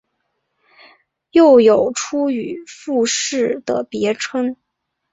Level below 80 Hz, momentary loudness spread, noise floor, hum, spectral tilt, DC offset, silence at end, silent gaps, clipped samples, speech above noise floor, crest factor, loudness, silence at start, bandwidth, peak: -62 dBFS; 13 LU; -71 dBFS; none; -3.5 dB/octave; under 0.1%; 0.6 s; none; under 0.1%; 56 dB; 16 dB; -16 LUFS; 1.35 s; 8 kHz; -2 dBFS